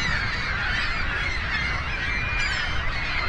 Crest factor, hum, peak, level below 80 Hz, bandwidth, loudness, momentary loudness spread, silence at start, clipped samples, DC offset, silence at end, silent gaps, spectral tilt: 14 dB; none; -12 dBFS; -32 dBFS; 10.5 kHz; -25 LUFS; 2 LU; 0 s; under 0.1%; under 0.1%; 0 s; none; -3.5 dB/octave